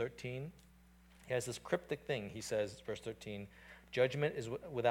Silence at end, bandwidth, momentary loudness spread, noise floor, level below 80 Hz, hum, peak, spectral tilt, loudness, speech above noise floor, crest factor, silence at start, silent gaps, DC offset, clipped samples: 0 s; 17.5 kHz; 12 LU; -64 dBFS; -66 dBFS; none; -20 dBFS; -5 dB/octave; -40 LUFS; 24 dB; 20 dB; 0 s; none; under 0.1%; under 0.1%